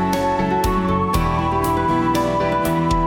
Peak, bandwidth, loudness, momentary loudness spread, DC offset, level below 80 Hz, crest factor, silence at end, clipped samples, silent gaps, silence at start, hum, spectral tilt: -6 dBFS; 18 kHz; -19 LUFS; 1 LU; under 0.1%; -30 dBFS; 12 dB; 0 s; under 0.1%; none; 0 s; none; -6.5 dB/octave